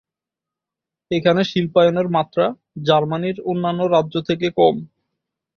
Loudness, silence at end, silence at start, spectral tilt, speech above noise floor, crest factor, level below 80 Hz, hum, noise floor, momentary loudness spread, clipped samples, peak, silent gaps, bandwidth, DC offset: -19 LUFS; 0.7 s; 1.1 s; -7 dB/octave; 69 dB; 18 dB; -58 dBFS; none; -87 dBFS; 7 LU; under 0.1%; -2 dBFS; none; 6.8 kHz; under 0.1%